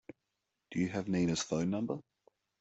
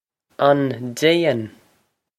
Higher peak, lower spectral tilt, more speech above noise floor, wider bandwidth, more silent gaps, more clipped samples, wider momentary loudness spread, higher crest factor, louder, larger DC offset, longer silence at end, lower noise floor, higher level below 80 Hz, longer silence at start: second, -20 dBFS vs -2 dBFS; about the same, -5.5 dB/octave vs -5.5 dB/octave; first, 52 dB vs 47 dB; second, 8.2 kHz vs 15 kHz; neither; neither; about the same, 8 LU vs 9 LU; about the same, 16 dB vs 20 dB; second, -35 LUFS vs -19 LUFS; neither; about the same, 0.6 s vs 0.7 s; first, -86 dBFS vs -65 dBFS; about the same, -66 dBFS vs -66 dBFS; first, 0.7 s vs 0.4 s